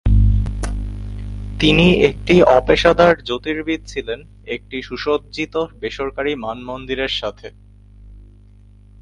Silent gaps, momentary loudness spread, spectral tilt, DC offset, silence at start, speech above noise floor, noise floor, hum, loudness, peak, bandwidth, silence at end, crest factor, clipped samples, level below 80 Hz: none; 17 LU; -6.5 dB/octave; under 0.1%; 0.05 s; 28 dB; -45 dBFS; 50 Hz at -35 dBFS; -17 LUFS; 0 dBFS; 11.5 kHz; 0.8 s; 18 dB; under 0.1%; -26 dBFS